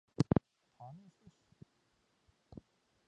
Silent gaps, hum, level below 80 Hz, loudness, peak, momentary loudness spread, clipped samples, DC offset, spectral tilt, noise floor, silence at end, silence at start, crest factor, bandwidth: none; none; -60 dBFS; -34 LUFS; -14 dBFS; 24 LU; under 0.1%; under 0.1%; -8.5 dB/octave; -77 dBFS; 2.2 s; 0.2 s; 28 dB; 9.6 kHz